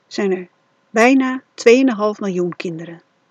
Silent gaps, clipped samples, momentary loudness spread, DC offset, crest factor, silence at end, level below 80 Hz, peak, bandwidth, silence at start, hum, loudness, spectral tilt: none; under 0.1%; 15 LU; under 0.1%; 18 dB; 0.35 s; -72 dBFS; 0 dBFS; 9.8 kHz; 0.1 s; none; -16 LUFS; -5 dB/octave